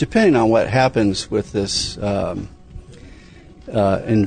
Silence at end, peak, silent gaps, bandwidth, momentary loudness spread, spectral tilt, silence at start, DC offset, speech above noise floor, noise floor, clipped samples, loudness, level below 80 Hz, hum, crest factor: 0 s; -4 dBFS; none; 9.6 kHz; 11 LU; -5.5 dB/octave; 0 s; under 0.1%; 25 dB; -42 dBFS; under 0.1%; -18 LUFS; -40 dBFS; none; 16 dB